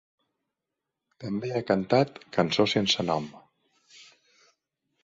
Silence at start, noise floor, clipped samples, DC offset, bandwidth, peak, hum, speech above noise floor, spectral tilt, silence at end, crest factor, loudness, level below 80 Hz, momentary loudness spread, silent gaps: 1.2 s; -86 dBFS; under 0.1%; under 0.1%; 7.8 kHz; -6 dBFS; none; 60 dB; -5 dB/octave; 1 s; 22 dB; -26 LUFS; -64 dBFS; 11 LU; none